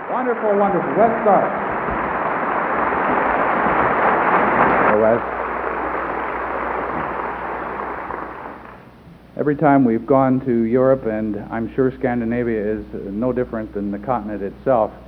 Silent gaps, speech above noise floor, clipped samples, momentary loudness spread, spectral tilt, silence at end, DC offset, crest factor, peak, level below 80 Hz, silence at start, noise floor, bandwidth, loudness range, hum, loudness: none; 25 dB; under 0.1%; 11 LU; -10 dB/octave; 0 s; under 0.1%; 18 dB; 0 dBFS; -44 dBFS; 0 s; -43 dBFS; 5.2 kHz; 7 LU; none; -19 LUFS